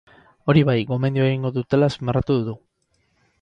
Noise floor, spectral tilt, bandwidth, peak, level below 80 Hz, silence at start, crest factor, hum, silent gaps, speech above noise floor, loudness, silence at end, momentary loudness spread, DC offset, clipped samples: -68 dBFS; -8.5 dB/octave; 7.6 kHz; -4 dBFS; -46 dBFS; 0.45 s; 16 dB; none; none; 48 dB; -21 LUFS; 0.85 s; 9 LU; under 0.1%; under 0.1%